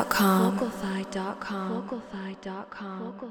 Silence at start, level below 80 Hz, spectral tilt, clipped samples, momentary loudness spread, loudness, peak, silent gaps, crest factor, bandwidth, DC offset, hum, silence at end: 0 s; -60 dBFS; -5.5 dB/octave; under 0.1%; 16 LU; -29 LUFS; -8 dBFS; none; 20 dB; over 20 kHz; under 0.1%; none; 0 s